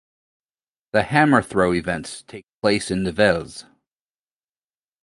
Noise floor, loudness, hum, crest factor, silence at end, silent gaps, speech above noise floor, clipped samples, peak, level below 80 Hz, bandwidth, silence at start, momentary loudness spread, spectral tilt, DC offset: under -90 dBFS; -20 LUFS; none; 22 dB; 1.4 s; 2.54-2.59 s; over 70 dB; under 0.1%; 0 dBFS; -48 dBFS; 11.5 kHz; 0.95 s; 20 LU; -5.5 dB/octave; under 0.1%